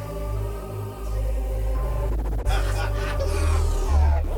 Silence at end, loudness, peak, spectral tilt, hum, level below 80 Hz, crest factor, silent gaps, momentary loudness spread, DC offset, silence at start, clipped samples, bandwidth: 0 s; -26 LUFS; -10 dBFS; -6 dB/octave; none; -24 dBFS; 12 dB; none; 9 LU; under 0.1%; 0 s; under 0.1%; 17.5 kHz